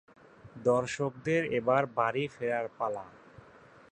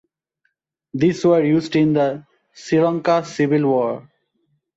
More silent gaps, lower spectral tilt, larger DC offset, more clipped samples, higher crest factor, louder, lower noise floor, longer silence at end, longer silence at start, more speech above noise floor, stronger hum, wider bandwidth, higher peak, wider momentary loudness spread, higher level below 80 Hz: neither; about the same, -6 dB/octave vs -7 dB/octave; neither; neither; first, 20 dB vs 14 dB; second, -31 LUFS vs -18 LUFS; second, -56 dBFS vs -71 dBFS; about the same, 0.8 s vs 0.75 s; second, 0.45 s vs 0.95 s; second, 26 dB vs 54 dB; neither; first, 9.2 kHz vs 8 kHz; second, -12 dBFS vs -6 dBFS; second, 8 LU vs 15 LU; second, -68 dBFS vs -60 dBFS